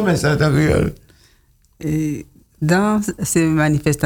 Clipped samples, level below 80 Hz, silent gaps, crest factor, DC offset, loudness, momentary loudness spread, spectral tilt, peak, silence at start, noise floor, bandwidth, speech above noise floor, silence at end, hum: under 0.1%; -38 dBFS; none; 14 dB; under 0.1%; -18 LUFS; 9 LU; -6 dB/octave; -4 dBFS; 0 s; -55 dBFS; 18.5 kHz; 39 dB; 0 s; none